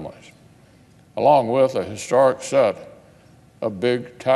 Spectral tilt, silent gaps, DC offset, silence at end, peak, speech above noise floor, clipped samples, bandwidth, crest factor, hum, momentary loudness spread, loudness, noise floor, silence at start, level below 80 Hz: -5.5 dB/octave; none; under 0.1%; 0 s; -4 dBFS; 33 dB; under 0.1%; 12 kHz; 18 dB; none; 15 LU; -20 LUFS; -51 dBFS; 0 s; -64 dBFS